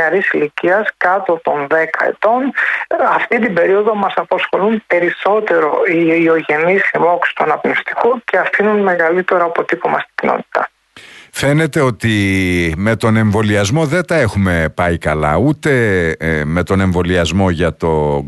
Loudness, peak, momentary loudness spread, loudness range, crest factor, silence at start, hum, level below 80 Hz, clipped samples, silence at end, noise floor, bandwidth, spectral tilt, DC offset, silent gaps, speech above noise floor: -14 LUFS; -2 dBFS; 4 LU; 2 LU; 12 dB; 0 s; none; -38 dBFS; under 0.1%; 0 s; -39 dBFS; 12 kHz; -6 dB/octave; under 0.1%; none; 26 dB